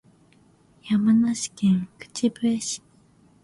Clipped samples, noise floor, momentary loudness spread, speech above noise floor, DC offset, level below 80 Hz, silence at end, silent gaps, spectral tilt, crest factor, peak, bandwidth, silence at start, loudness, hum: under 0.1%; -58 dBFS; 11 LU; 35 dB; under 0.1%; -64 dBFS; 0.65 s; none; -5 dB/octave; 14 dB; -10 dBFS; 11.5 kHz; 0.85 s; -24 LUFS; none